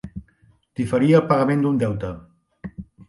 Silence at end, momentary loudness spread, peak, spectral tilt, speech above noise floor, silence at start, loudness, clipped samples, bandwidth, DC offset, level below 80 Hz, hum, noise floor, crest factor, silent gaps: 0.25 s; 23 LU; -4 dBFS; -8.5 dB/octave; 39 dB; 0.05 s; -20 LUFS; under 0.1%; 11.5 kHz; under 0.1%; -48 dBFS; none; -58 dBFS; 18 dB; none